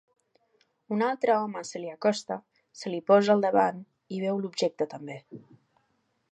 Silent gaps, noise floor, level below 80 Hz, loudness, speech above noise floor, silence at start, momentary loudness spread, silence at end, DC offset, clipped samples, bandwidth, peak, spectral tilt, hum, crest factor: none; -73 dBFS; -82 dBFS; -27 LUFS; 46 dB; 0.9 s; 17 LU; 0.95 s; under 0.1%; under 0.1%; 9.6 kHz; -8 dBFS; -5.5 dB/octave; none; 20 dB